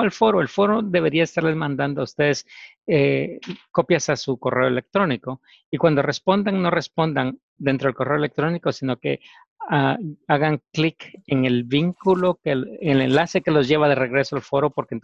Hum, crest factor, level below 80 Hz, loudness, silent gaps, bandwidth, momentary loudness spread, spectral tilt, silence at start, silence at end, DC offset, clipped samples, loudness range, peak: none; 18 dB; -58 dBFS; -21 LUFS; 2.78-2.82 s, 5.66-5.72 s, 7.43-7.56 s, 9.48-9.56 s; 8 kHz; 8 LU; -6 dB/octave; 0 s; 0.05 s; under 0.1%; under 0.1%; 3 LU; -4 dBFS